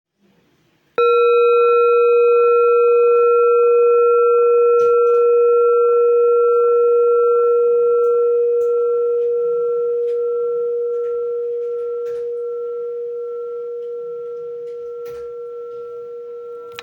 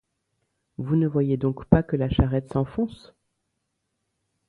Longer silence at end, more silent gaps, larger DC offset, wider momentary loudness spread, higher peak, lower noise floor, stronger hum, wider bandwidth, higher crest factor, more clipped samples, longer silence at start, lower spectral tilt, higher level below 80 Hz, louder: second, 0 s vs 1.55 s; neither; neither; first, 17 LU vs 9 LU; second, -6 dBFS vs 0 dBFS; second, -60 dBFS vs -78 dBFS; neither; second, 4.1 kHz vs 4.6 kHz; second, 10 dB vs 26 dB; neither; first, 1 s vs 0.8 s; second, -4 dB/octave vs -10 dB/octave; second, -72 dBFS vs -38 dBFS; first, -15 LUFS vs -24 LUFS